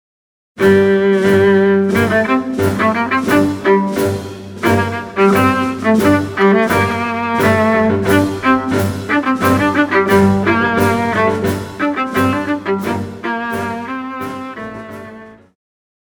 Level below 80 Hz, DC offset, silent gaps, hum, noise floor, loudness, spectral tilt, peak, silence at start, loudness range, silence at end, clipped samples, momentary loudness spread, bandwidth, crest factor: -46 dBFS; under 0.1%; none; none; -36 dBFS; -14 LUFS; -6.5 dB/octave; 0 dBFS; 0.55 s; 6 LU; 0.75 s; under 0.1%; 12 LU; over 20 kHz; 14 dB